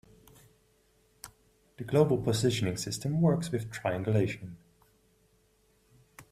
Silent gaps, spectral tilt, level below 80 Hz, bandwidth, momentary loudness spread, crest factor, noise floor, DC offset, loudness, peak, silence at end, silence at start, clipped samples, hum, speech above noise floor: none; -6 dB/octave; -60 dBFS; 15.5 kHz; 23 LU; 22 dB; -68 dBFS; under 0.1%; -30 LUFS; -10 dBFS; 0.1 s; 1.25 s; under 0.1%; none; 39 dB